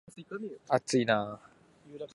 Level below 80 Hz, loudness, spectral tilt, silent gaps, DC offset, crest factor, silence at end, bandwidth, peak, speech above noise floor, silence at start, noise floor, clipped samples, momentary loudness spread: -74 dBFS; -31 LUFS; -4.5 dB/octave; none; under 0.1%; 22 dB; 0.1 s; 11.5 kHz; -10 dBFS; 21 dB; 0.15 s; -52 dBFS; under 0.1%; 20 LU